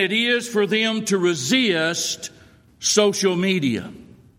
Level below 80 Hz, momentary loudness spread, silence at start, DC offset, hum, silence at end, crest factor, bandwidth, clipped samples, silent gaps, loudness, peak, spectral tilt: -62 dBFS; 9 LU; 0 s; under 0.1%; none; 0.35 s; 18 dB; 16.5 kHz; under 0.1%; none; -20 LUFS; -2 dBFS; -3 dB/octave